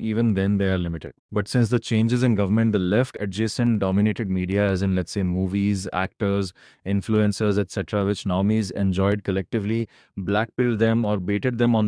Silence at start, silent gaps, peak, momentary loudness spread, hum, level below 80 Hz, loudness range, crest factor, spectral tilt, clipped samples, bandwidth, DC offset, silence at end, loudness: 0 s; 1.19-1.29 s; -6 dBFS; 6 LU; none; -50 dBFS; 2 LU; 16 dB; -7 dB/octave; under 0.1%; 10.5 kHz; under 0.1%; 0 s; -23 LUFS